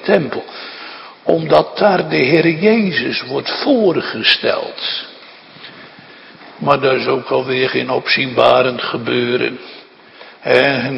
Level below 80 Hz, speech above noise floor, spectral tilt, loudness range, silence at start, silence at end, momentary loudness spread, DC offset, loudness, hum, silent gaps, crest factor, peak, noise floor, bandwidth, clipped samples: -58 dBFS; 25 dB; -7 dB/octave; 4 LU; 0 s; 0 s; 17 LU; under 0.1%; -15 LUFS; none; none; 16 dB; 0 dBFS; -40 dBFS; 9 kHz; under 0.1%